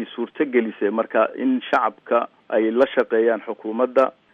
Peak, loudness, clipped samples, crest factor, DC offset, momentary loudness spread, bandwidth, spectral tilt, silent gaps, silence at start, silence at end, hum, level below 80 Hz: -4 dBFS; -21 LUFS; under 0.1%; 16 dB; under 0.1%; 6 LU; 7 kHz; -6.5 dB/octave; none; 0 s; 0.25 s; none; -72 dBFS